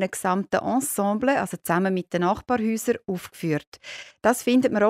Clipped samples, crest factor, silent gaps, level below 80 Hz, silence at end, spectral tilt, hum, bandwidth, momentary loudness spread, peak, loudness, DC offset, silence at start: under 0.1%; 18 dB; 3.67-3.72 s; -60 dBFS; 0 s; -5 dB/octave; none; 16 kHz; 9 LU; -6 dBFS; -24 LUFS; under 0.1%; 0 s